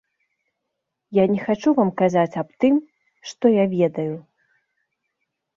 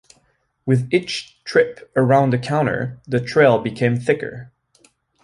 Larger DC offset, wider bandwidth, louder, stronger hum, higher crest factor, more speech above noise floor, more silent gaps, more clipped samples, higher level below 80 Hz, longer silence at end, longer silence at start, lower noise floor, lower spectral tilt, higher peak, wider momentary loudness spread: neither; second, 7.6 kHz vs 11 kHz; about the same, -20 LUFS vs -19 LUFS; neither; about the same, 16 dB vs 18 dB; first, 60 dB vs 46 dB; neither; neither; second, -64 dBFS vs -56 dBFS; first, 1.35 s vs 0.75 s; first, 1.1 s vs 0.65 s; first, -80 dBFS vs -64 dBFS; about the same, -7.5 dB/octave vs -6.5 dB/octave; second, -6 dBFS vs -2 dBFS; about the same, 11 LU vs 12 LU